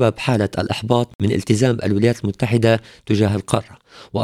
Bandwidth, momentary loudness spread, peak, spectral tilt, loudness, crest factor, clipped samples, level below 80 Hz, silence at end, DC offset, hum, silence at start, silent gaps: 14 kHz; 6 LU; 0 dBFS; -6.5 dB/octave; -19 LUFS; 18 dB; under 0.1%; -48 dBFS; 0 s; under 0.1%; none; 0 s; 1.15-1.19 s